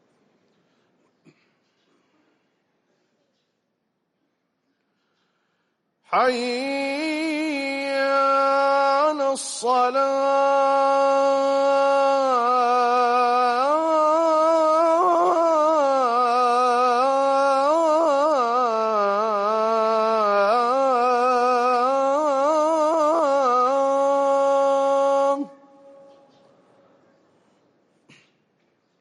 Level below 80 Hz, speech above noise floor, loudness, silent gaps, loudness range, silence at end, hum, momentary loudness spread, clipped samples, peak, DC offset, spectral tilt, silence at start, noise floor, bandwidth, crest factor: -74 dBFS; 54 dB; -20 LUFS; none; 7 LU; 3.55 s; none; 5 LU; under 0.1%; -10 dBFS; under 0.1%; -3 dB/octave; 6.1 s; -75 dBFS; 11.5 kHz; 12 dB